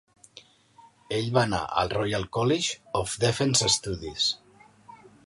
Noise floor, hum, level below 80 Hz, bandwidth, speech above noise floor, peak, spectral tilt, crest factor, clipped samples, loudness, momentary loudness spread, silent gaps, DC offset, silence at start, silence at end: -56 dBFS; none; -52 dBFS; 11.5 kHz; 30 dB; -6 dBFS; -3.5 dB/octave; 22 dB; under 0.1%; -26 LUFS; 8 LU; none; under 0.1%; 0.35 s; 0.35 s